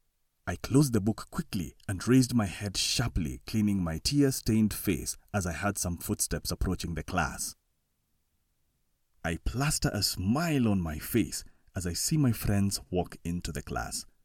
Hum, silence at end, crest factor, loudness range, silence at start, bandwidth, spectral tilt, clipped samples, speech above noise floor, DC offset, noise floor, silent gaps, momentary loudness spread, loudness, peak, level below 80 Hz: none; 0.2 s; 20 dB; 6 LU; 0.45 s; 17.5 kHz; -4.5 dB/octave; under 0.1%; 46 dB; under 0.1%; -76 dBFS; none; 10 LU; -30 LUFS; -10 dBFS; -44 dBFS